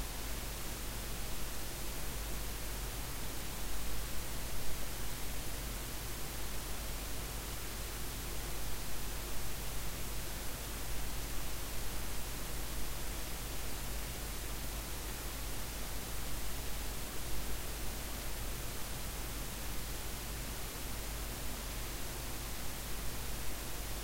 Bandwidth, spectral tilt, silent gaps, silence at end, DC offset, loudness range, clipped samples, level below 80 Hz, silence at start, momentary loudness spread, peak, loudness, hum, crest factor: 16 kHz; -3 dB/octave; none; 0 s; under 0.1%; 0 LU; under 0.1%; -44 dBFS; 0 s; 0 LU; -22 dBFS; -42 LUFS; none; 16 dB